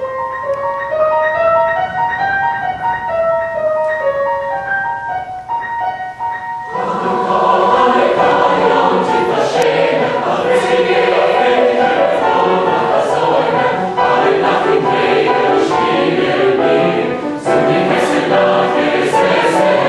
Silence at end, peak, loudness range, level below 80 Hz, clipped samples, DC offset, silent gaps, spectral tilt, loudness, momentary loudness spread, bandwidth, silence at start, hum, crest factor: 0 s; 0 dBFS; 5 LU; -50 dBFS; under 0.1%; under 0.1%; none; -5 dB/octave; -14 LUFS; 8 LU; 12 kHz; 0 s; none; 14 dB